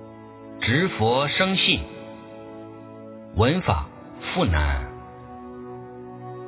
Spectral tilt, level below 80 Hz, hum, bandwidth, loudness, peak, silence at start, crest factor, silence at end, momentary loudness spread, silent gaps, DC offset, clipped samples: -9.5 dB/octave; -34 dBFS; none; 4 kHz; -22 LUFS; -6 dBFS; 0 s; 20 dB; 0 s; 21 LU; none; under 0.1%; under 0.1%